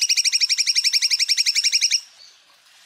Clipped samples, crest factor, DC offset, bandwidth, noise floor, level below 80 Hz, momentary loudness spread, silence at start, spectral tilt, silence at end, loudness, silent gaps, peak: under 0.1%; 14 dB; under 0.1%; 16 kHz; -53 dBFS; under -90 dBFS; 2 LU; 0 s; 8.5 dB/octave; 0.8 s; -17 LUFS; none; -8 dBFS